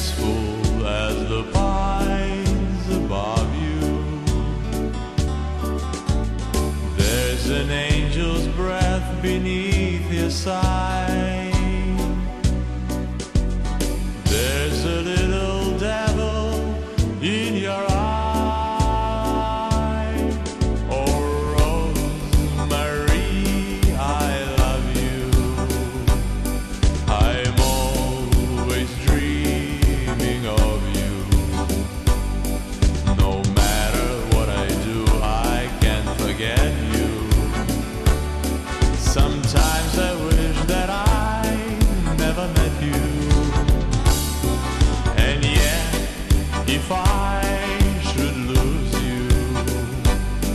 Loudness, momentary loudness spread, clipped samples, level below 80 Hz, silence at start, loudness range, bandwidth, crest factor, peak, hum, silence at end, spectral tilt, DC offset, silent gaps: -22 LUFS; 5 LU; under 0.1%; -22 dBFS; 0 s; 3 LU; 13 kHz; 16 dB; -4 dBFS; none; 0 s; -5 dB/octave; under 0.1%; none